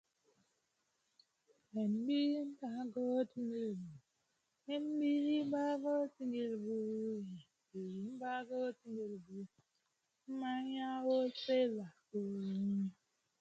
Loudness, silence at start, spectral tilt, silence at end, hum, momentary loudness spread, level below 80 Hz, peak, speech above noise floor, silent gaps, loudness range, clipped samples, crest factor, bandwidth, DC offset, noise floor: -40 LUFS; 1.75 s; -7 dB/octave; 0.5 s; none; 13 LU; -88 dBFS; -24 dBFS; 45 dB; none; 6 LU; under 0.1%; 16 dB; 8 kHz; under 0.1%; -84 dBFS